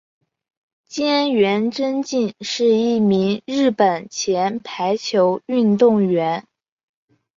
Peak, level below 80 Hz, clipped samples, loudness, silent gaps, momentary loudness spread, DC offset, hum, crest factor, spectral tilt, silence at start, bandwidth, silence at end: -4 dBFS; -64 dBFS; under 0.1%; -19 LUFS; none; 8 LU; under 0.1%; none; 16 dB; -5 dB/octave; 0.9 s; 7.6 kHz; 0.95 s